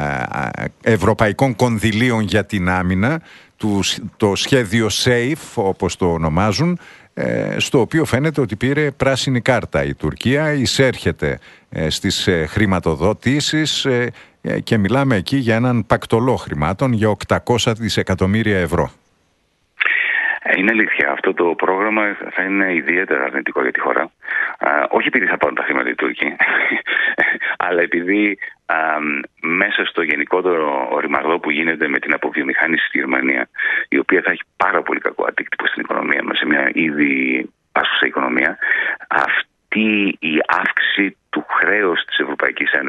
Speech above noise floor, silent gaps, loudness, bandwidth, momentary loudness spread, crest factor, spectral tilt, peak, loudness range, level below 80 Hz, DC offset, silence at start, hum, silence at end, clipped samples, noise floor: 45 dB; none; -17 LUFS; 12 kHz; 6 LU; 18 dB; -5 dB/octave; 0 dBFS; 2 LU; -44 dBFS; under 0.1%; 0 s; none; 0 s; under 0.1%; -63 dBFS